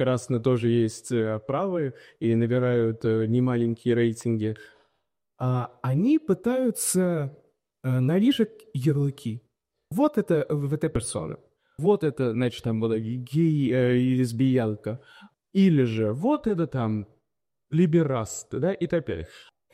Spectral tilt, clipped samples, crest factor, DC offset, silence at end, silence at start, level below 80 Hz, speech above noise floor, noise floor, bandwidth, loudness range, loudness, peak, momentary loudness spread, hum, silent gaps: -6.5 dB/octave; under 0.1%; 14 dB; under 0.1%; 0.35 s; 0 s; -56 dBFS; 60 dB; -84 dBFS; 15.5 kHz; 3 LU; -25 LUFS; -10 dBFS; 11 LU; none; none